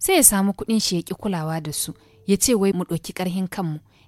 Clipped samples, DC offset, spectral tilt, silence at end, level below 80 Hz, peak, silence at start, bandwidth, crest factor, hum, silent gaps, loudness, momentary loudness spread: under 0.1%; under 0.1%; -3.5 dB/octave; 0.3 s; -48 dBFS; 0 dBFS; 0 s; 16.5 kHz; 22 dB; none; none; -21 LUFS; 14 LU